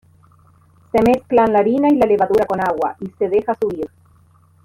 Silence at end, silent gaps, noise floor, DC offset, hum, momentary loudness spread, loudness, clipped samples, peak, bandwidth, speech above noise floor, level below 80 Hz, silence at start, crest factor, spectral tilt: 0.8 s; none; -52 dBFS; under 0.1%; none; 9 LU; -17 LUFS; under 0.1%; -4 dBFS; 15.5 kHz; 36 dB; -48 dBFS; 0.95 s; 14 dB; -7.5 dB/octave